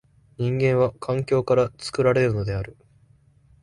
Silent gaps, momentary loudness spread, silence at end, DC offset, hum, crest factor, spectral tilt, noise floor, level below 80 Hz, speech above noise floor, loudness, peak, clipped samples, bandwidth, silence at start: none; 9 LU; 0.9 s; under 0.1%; none; 16 dB; -7 dB/octave; -57 dBFS; -48 dBFS; 35 dB; -23 LUFS; -8 dBFS; under 0.1%; 11.5 kHz; 0.4 s